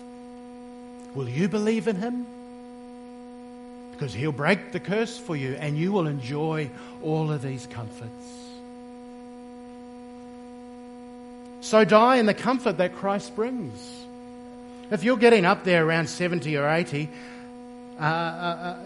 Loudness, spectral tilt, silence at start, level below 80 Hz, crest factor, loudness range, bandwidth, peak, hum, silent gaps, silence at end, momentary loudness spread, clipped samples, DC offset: -24 LUFS; -6 dB/octave; 0 s; -64 dBFS; 24 dB; 12 LU; 11.5 kHz; -4 dBFS; none; none; 0 s; 23 LU; under 0.1%; under 0.1%